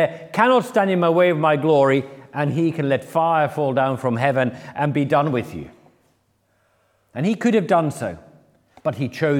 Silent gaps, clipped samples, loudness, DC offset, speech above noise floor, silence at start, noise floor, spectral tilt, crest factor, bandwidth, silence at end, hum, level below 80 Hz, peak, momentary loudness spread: none; under 0.1%; -20 LUFS; under 0.1%; 46 dB; 0 s; -65 dBFS; -7 dB/octave; 18 dB; 16 kHz; 0 s; none; -64 dBFS; -2 dBFS; 11 LU